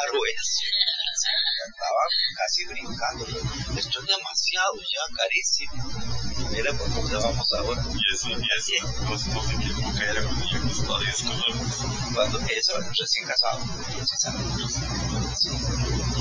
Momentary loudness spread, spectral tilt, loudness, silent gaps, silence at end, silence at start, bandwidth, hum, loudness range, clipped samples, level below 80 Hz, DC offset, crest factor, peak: 7 LU; -2.5 dB/octave; -25 LUFS; none; 0 s; 0 s; 7.6 kHz; none; 2 LU; under 0.1%; -38 dBFS; under 0.1%; 18 dB; -8 dBFS